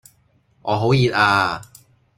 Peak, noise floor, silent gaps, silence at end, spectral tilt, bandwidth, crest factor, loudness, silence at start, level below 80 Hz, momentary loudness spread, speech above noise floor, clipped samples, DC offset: -2 dBFS; -60 dBFS; none; 0.55 s; -6 dB/octave; 15 kHz; 18 dB; -18 LUFS; 0.65 s; -52 dBFS; 15 LU; 42 dB; under 0.1%; under 0.1%